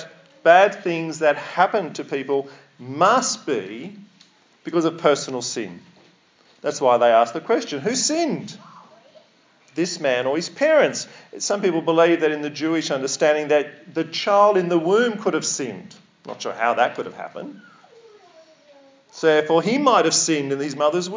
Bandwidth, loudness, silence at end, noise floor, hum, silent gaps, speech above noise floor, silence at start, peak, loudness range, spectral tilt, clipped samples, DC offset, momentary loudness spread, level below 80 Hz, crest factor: 7.8 kHz; -20 LUFS; 0 s; -57 dBFS; none; none; 36 dB; 0 s; 0 dBFS; 6 LU; -3.5 dB/octave; under 0.1%; under 0.1%; 16 LU; -82 dBFS; 20 dB